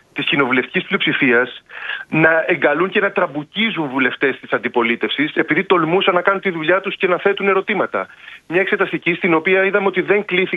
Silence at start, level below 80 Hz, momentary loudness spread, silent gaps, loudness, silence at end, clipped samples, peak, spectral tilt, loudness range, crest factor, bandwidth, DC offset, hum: 0.15 s; -64 dBFS; 7 LU; none; -17 LUFS; 0 s; under 0.1%; 0 dBFS; -7.5 dB/octave; 1 LU; 16 dB; 4.7 kHz; under 0.1%; none